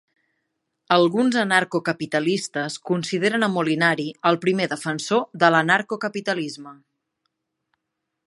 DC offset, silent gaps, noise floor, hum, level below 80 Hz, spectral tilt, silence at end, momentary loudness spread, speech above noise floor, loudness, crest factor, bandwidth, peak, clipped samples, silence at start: under 0.1%; none; -80 dBFS; none; -72 dBFS; -4.5 dB/octave; 1.55 s; 9 LU; 59 dB; -21 LUFS; 20 dB; 11.5 kHz; -2 dBFS; under 0.1%; 0.9 s